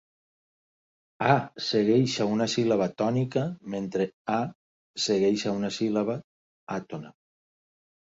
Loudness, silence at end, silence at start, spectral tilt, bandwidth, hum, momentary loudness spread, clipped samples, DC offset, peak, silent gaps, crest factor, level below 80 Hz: -27 LUFS; 0.9 s; 1.2 s; -5.5 dB/octave; 8 kHz; none; 12 LU; under 0.1%; under 0.1%; -8 dBFS; 4.14-4.25 s, 4.55-4.94 s, 6.24-6.67 s; 20 dB; -66 dBFS